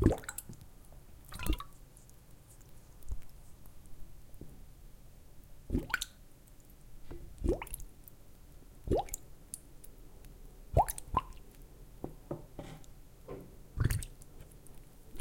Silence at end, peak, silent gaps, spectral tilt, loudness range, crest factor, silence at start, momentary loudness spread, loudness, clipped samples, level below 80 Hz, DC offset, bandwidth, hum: 0 s; -12 dBFS; none; -5.5 dB/octave; 10 LU; 28 dB; 0 s; 24 LU; -39 LUFS; under 0.1%; -46 dBFS; under 0.1%; 17 kHz; none